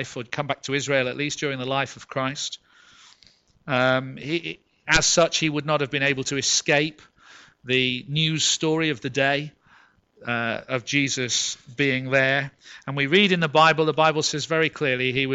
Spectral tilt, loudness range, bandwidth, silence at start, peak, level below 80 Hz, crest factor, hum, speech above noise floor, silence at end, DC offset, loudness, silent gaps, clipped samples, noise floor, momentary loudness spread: -3 dB/octave; 6 LU; 8.2 kHz; 0 s; -4 dBFS; -52 dBFS; 20 dB; none; 35 dB; 0 s; under 0.1%; -22 LUFS; none; under 0.1%; -58 dBFS; 12 LU